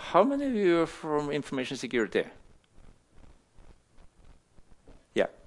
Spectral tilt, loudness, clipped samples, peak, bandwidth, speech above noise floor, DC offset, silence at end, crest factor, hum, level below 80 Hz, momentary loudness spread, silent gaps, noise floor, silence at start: -5.5 dB/octave; -29 LUFS; under 0.1%; -8 dBFS; 11.5 kHz; 28 dB; under 0.1%; 0.15 s; 24 dB; none; -58 dBFS; 9 LU; none; -56 dBFS; 0 s